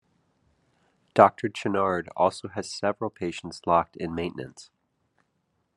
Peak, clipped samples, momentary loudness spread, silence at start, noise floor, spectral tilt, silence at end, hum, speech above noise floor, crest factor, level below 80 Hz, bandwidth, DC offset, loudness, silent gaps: -2 dBFS; under 0.1%; 14 LU; 1.15 s; -74 dBFS; -5.5 dB/octave; 1.15 s; none; 48 dB; 26 dB; -64 dBFS; 11.5 kHz; under 0.1%; -26 LUFS; none